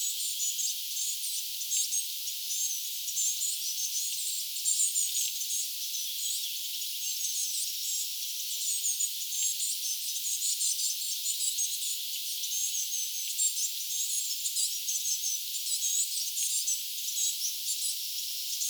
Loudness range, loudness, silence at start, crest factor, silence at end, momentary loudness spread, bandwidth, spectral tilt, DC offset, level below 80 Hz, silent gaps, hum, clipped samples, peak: 1 LU; -29 LUFS; 0 s; 20 dB; 0 s; 4 LU; over 20 kHz; 13 dB/octave; under 0.1%; under -90 dBFS; none; none; under 0.1%; -14 dBFS